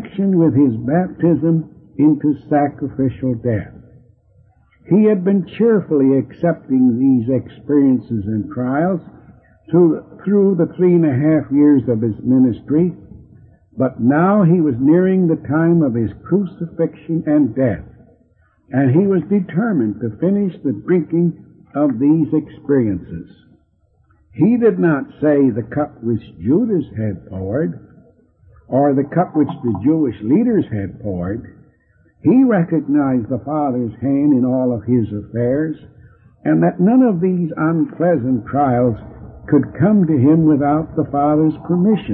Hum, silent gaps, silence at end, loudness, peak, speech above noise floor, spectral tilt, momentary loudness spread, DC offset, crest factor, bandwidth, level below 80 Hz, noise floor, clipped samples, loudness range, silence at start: none; none; 0 s; -16 LUFS; -2 dBFS; 42 dB; -14 dB/octave; 9 LU; under 0.1%; 14 dB; 3.6 kHz; -50 dBFS; -58 dBFS; under 0.1%; 4 LU; 0 s